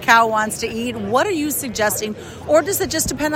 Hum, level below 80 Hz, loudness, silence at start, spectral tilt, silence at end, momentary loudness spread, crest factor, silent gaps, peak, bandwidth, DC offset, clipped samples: none; -44 dBFS; -19 LUFS; 0 s; -3 dB/octave; 0 s; 9 LU; 18 dB; none; 0 dBFS; 16.5 kHz; under 0.1%; under 0.1%